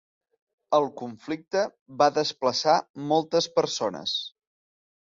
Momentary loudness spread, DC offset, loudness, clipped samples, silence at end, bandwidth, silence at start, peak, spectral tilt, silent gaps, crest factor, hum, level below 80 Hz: 10 LU; under 0.1%; -26 LUFS; under 0.1%; 0.85 s; 7.8 kHz; 0.7 s; -6 dBFS; -3.5 dB/octave; 1.81-1.86 s, 2.90-2.94 s; 20 dB; none; -72 dBFS